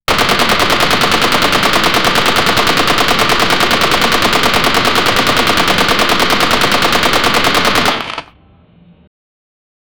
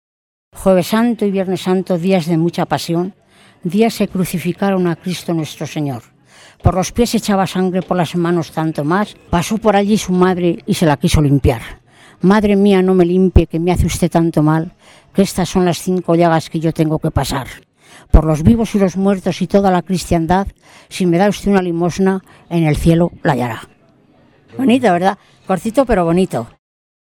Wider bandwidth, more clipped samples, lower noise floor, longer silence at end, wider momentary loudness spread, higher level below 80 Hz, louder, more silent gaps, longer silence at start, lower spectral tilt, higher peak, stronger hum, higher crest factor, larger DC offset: first, over 20 kHz vs 18 kHz; neither; second, -45 dBFS vs -50 dBFS; first, 0.9 s vs 0.6 s; second, 0 LU vs 9 LU; about the same, -32 dBFS vs -28 dBFS; first, -10 LUFS vs -15 LUFS; neither; second, 0 s vs 0.55 s; second, -2.5 dB/octave vs -6.5 dB/octave; about the same, 0 dBFS vs 0 dBFS; neither; about the same, 12 dB vs 14 dB; first, 8% vs under 0.1%